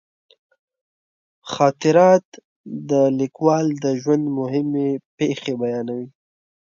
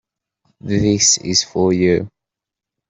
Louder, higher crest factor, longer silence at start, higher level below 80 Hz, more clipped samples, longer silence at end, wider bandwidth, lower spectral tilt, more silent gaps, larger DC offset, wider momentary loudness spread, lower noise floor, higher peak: second, -19 LUFS vs -15 LUFS; about the same, 20 dB vs 16 dB; first, 1.45 s vs 0.65 s; second, -68 dBFS vs -48 dBFS; neither; second, 0.6 s vs 0.8 s; second, 7.4 kHz vs 8.4 kHz; first, -6.5 dB/octave vs -3.5 dB/octave; first, 2.25-2.32 s, 2.45-2.64 s, 5.05-5.18 s vs none; neither; first, 16 LU vs 13 LU; first, under -90 dBFS vs -85 dBFS; about the same, -2 dBFS vs -2 dBFS